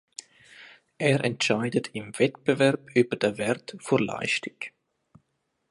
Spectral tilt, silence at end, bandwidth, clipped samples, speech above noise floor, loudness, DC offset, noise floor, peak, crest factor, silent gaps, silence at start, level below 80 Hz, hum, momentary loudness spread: -5 dB/octave; 1 s; 11.5 kHz; under 0.1%; 50 dB; -26 LUFS; under 0.1%; -76 dBFS; -8 dBFS; 20 dB; none; 0.6 s; -68 dBFS; none; 14 LU